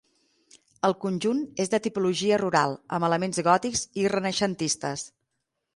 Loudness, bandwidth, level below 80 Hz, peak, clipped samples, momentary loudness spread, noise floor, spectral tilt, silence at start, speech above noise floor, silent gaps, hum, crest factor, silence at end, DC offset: -26 LUFS; 11.5 kHz; -64 dBFS; -8 dBFS; under 0.1%; 6 LU; -80 dBFS; -4 dB/octave; 0.85 s; 55 dB; none; none; 20 dB; 0.7 s; under 0.1%